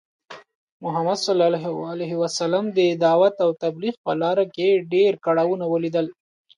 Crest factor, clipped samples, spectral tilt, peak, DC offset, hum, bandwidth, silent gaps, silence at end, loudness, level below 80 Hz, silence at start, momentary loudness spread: 16 dB; under 0.1%; -5.5 dB/octave; -6 dBFS; under 0.1%; none; 11.5 kHz; 0.55-0.80 s, 3.97-4.04 s; 0.45 s; -21 LUFS; -74 dBFS; 0.3 s; 10 LU